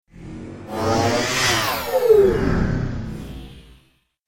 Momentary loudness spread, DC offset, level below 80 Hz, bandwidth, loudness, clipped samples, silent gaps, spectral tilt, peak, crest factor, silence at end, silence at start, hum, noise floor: 21 LU; under 0.1%; -34 dBFS; 17 kHz; -19 LUFS; under 0.1%; none; -4.5 dB/octave; -4 dBFS; 18 dB; 0.65 s; 0.15 s; none; -59 dBFS